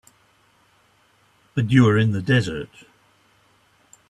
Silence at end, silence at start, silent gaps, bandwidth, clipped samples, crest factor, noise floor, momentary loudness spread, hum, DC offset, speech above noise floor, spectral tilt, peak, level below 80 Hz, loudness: 1.45 s; 1.55 s; none; 10.5 kHz; under 0.1%; 20 dB; -60 dBFS; 16 LU; none; under 0.1%; 41 dB; -7 dB/octave; -2 dBFS; -54 dBFS; -20 LUFS